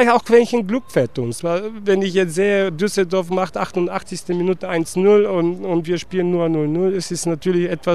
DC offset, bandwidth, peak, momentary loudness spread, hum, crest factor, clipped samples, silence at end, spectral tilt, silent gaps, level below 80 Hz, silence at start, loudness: 1%; 13.5 kHz; -2 dBFS; 8 LU; none; 16 dB; under 0.1%; 0 s; -5.5 dB/octave; none; -52 dBFS; 0 s; -19 LUFS